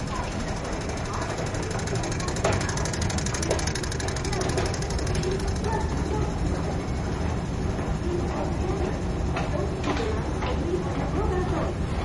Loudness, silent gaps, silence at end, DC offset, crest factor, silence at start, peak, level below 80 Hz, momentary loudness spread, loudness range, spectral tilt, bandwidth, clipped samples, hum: -28 LUFS; none; 0 s; under 0.1%; 20 dB; 0 s; -8 dBFS; -34 dBFS; 3 LU; 1 LU; -5.5 dB/octave; 11.5 kHz; under 0.1%; none